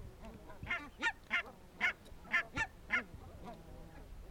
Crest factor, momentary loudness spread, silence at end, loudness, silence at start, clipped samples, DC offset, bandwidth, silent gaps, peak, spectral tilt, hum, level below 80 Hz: 22 dB; 18 LU; 0 s; -37 LUFS; 0 s; under 0.1%; under 0.1%; 19 kHz; none; -20 dBFS; -3.5 dB/octave; none; -56 dBFS